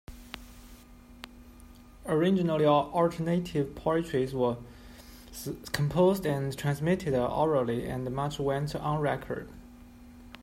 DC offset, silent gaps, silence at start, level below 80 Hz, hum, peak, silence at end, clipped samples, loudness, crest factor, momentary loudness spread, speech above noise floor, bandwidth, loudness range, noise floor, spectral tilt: under 0.1%; none; 0.1 s; -52 dBFS; none; -10 dBFS; 0 s; under 0.1%; -29 LUFS; 20 dB; 23 LU; 23 dB; 16 kHz; 3 LU; -52 dBFS; -7 dB/octave